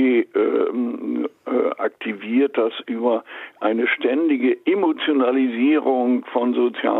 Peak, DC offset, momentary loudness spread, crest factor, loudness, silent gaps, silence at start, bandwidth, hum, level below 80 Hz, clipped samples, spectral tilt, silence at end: -6 dBFS; under 0.1%; 7 LU; 14 dB; -21 LUFS; none; 0 s; 4.1 kHz; none; -76 dBFS; under 0.1%; -7.5 dB/octave; 0 s